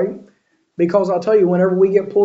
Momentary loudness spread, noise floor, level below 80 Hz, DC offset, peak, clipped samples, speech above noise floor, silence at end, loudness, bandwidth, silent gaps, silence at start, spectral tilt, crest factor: 15 LU; -57 dBFS; -64 dBFS; under 0.1%; -2 dBFS; under 0.1%; 43 dB; 0 s; -16 LUFS; 7.6 kHz; none; 0 s; -9 dB/octave; 14 dB